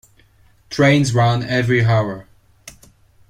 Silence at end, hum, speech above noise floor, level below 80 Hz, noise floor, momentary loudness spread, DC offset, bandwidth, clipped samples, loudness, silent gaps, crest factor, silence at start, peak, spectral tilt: 0.6 s; none; 37 dB; -48 dBFS; -53 dBFS; 13 LU; under 0.1%; 11.5 kHz; under 0.1%; -16 LUFS; none; 16 dB; 0.7 s; -4 dBFS; -6 dB/octave